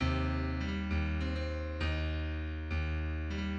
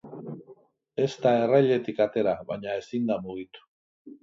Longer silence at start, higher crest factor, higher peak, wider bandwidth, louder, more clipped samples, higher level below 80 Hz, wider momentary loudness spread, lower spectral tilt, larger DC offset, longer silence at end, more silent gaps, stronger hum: about the same, 0 s vs 0.05 s; second, 14 dB vs 20 dB; second, -20 dBFS vs -8 dBFS; about the same, 7 kHz vs 7.6 kHz; second, -36 LUFS vs -26 LUFS; neither; first, -38 dBFS vs -68 dBFS; second, 4 LU vs 19 LU; about the same, -7.5 dB/octave vs -7 dB/octave; neither; about the same, 0 s vs 0.1 s; second, none vs 3.68-4.05 s; neither